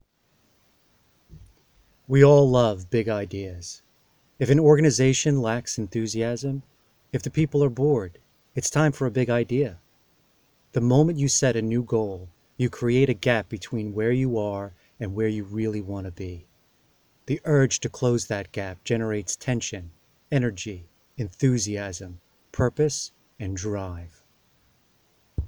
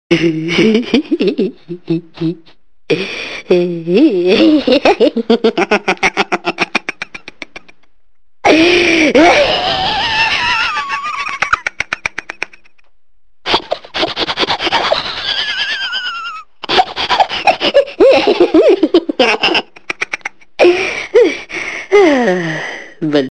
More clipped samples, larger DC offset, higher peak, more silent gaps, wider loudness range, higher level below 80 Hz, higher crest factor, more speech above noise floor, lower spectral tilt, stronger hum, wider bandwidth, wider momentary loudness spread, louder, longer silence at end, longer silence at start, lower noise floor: neither; second, under 0.1% vs 0.8%; about the same, -2 dBFS vs 0 dBFS; neither; about the same, 6 LU vs 6 LU; second, -50 dBFS vs -44 dBFS; first, 22 dB vs 14 dB; second, 43 dB vs 50 dB; about the same, -5.5 dB/octave vs -4.5 dB/octave; neither; first, 16 kHz vs 9.2 kHz; first, 17 LU vs 13 LU; second, -24 LUFS vs -13 LUFS; about the same, 0 s vs 0 s; first, 1.3 s vs 0.1 s; first, -66 dBFS vs -62 dBFS